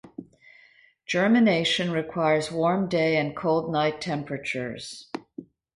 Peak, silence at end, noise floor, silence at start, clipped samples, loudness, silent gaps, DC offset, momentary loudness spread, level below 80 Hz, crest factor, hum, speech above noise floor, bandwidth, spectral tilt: -10 dBFS; 0.3 s; -58 dBFS; 0.05 s; under 0.1%; -24 LUFS; none; under 0.1%; 19 LU; -62 dBFS; 16 dB; none; 33 dB; 11.5 kHz; -5.5 dB/octave